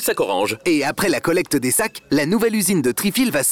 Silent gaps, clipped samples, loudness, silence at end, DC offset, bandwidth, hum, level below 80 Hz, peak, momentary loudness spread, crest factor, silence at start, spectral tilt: none; under 0.1%; -19 LUFS; 0 s; 0.2%; 18.5 kHz; none; -52 dBFS; -10 dBFS; 3 LU; 10 dB; 0 s; -3.5 dB/octave